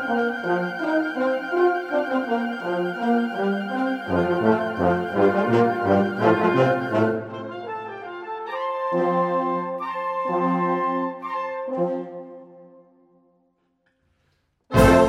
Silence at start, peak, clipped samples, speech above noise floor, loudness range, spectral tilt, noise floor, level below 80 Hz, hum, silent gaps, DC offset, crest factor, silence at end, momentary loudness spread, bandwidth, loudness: 0 s; -2 dBFS; under 0.1%; 46 dB; 8 LU; -7 dB/octave; -69 dBFS; -42 dBFS; none; none; under 0.1%; 20 dB; 0 s; 12 LU; 16 kHz; -23 LUFS